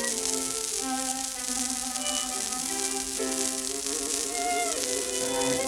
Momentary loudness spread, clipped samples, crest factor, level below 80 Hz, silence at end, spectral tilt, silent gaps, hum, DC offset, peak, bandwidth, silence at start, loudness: 2 LU; under 0.1%; 22 dB; -56 dBFS; 0 s; -0.5 dB/octave; none; none; under 0.1%; -6 dBFS; 19 kHz; 0 s; -27 LUFS